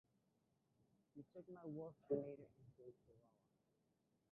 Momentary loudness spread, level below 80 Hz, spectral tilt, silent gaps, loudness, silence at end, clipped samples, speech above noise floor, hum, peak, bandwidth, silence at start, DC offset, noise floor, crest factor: 19 LU; -88 dBFS; -9 dB/octave; none; -51 LUFS; 1.1 s; under 0.1%; 32 dB; none; -32 dBFS; 2.9 kHz; 1.15 s; under 0.1%; -85 dBFS; 24 dB